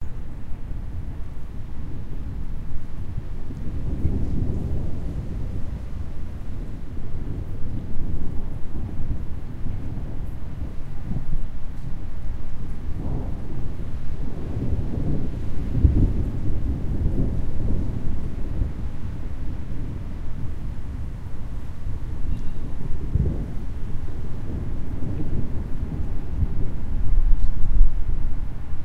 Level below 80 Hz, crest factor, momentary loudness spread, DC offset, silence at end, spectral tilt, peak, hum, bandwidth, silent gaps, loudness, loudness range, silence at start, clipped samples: -26 dBFS; 18 dB; 10 LU; under 0.1%; 0 s; -9 dB/octave; -2 dBFS; none; 2.7 kHz; none; -30 LUFS; 8 LU; 0 s; under 0.1%